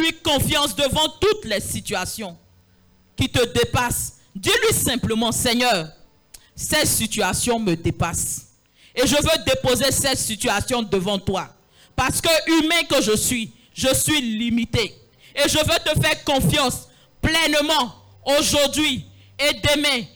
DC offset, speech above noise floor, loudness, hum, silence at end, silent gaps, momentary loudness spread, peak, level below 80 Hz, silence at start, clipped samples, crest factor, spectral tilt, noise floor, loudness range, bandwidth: under 0.1%; 35 dB; -20 LUFS; none; 0.1 s; none; 10 LU; -6 dBFS; -40 dBFS; 0 s; under 0.1%; 16 dB; -3 dB/octave; -56 dBFS; 3 LU; over 20 kHz